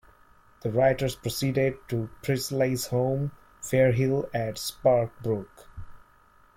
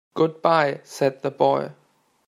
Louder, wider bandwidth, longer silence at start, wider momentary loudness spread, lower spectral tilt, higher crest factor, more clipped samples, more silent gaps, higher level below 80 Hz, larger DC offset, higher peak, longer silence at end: second, -27 LUFS vs -22 LUFS; about the same, 16.5 kHz vs 15 kHz; first, 0.65 s vs 0.15 s; first, 11 LU vs 6 LU; about the same, -6 dB/octave vs -6 dB/octave; about the same, 18 dB vs 20 dB; neither; neither; first, -52 dBFS vs -72 dBFS; neither; second, -10 dBFS vs -4 dBFS; about the same, 0.6 s vs 0.55 s